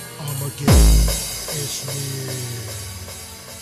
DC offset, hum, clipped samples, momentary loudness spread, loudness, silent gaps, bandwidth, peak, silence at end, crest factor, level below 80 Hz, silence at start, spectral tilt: under 0.1%; none; under 0.1%; 18 LU; -21 LUFS; none; 14 kHz; -4 dBFS; 0 s; 16 dB; -22 dBFS; 0 s; -4.5 dB/octave